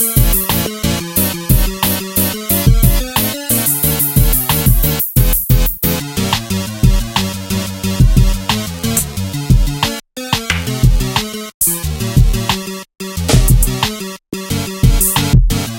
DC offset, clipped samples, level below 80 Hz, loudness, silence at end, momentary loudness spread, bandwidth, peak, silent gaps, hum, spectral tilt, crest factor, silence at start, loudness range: under 0.1%; under 0.1%; -18 dBFS; -14 LUFS; 0 s; 8 LU; 17.5 kHz; 0 dBFS; 11.54-11.60 s; none; -4 dB/octave; 14 dB; 0 s; 3 LU